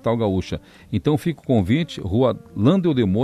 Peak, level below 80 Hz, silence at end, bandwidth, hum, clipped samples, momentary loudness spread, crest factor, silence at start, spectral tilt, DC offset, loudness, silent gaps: -4 dBFS; -46 dBFS; 0 s; 13.5 kHz; none; under 0.1%; 8 LU; 16 dB; 0.05 s; -8 dB/octave; under 0.1%; -21 LUFS; none